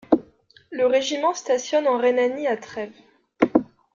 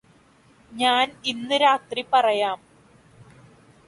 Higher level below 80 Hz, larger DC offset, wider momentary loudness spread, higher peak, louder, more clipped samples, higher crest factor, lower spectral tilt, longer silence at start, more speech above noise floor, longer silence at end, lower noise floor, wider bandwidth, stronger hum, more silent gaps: first, -62 dBFS vs -68 dBFS; neither; first, 13 LU vs 9 LU; first, -2 dBFS vs -6 dBFS; about the same, -22 LUFS vs -22 LUFS; neither; about the same, 20 dB vs 18 dB; about the same, -3.5 dB/octave vs -2.5 dB/octave; second, 0.1 s vs 0.7 s; about the same, 33 dB vs 34 dB; second, 0.3 s vs 1.3 s; about the same, -54 dBFS vs -56 dBFS; second, 7.4 kHz vs 11.5 kHz; neither; neither